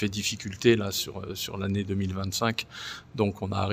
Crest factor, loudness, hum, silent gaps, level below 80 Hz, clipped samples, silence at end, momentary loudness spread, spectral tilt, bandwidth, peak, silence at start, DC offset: 20 dB; -29 LUFS; none; none; -58 dBFS; under 0.1%; 0 s; 10 LU; -4.5 dB/octave; 16 kHz; -8 dBFS; 0 s; under 0.1%